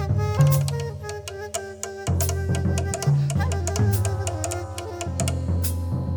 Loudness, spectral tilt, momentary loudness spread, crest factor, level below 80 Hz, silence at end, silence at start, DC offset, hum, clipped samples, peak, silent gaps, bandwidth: -25 LUFS; -5.5 dB/octave; 11 LU; 16 dB; -36 dBFS; 0 s; 0 s; under 0.1%; none; under 0.1%; -6 dBFS; none; over 20 kHz